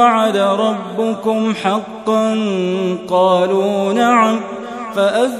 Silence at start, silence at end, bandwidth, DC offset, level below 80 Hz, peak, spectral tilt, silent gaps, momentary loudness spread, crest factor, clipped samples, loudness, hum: 0 s; 0 s; 13.5 kHz; under 0.1%; -62 dBFS; 0 dBFS; -5.5 dB/octave; none; 7 LU; 14 dB; under 0.1%; -16 LUFS; none